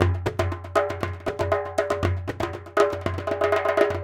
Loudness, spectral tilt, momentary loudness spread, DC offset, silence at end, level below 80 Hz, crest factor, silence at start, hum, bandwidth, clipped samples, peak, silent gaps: -25 LUFS; -6.5 dB/octave; 7 LU; under 0.1%; 0 s; -44 dBFS; 20 dB; 0 s; none; 16 kHz; under 0.1%; -4 dBFS; none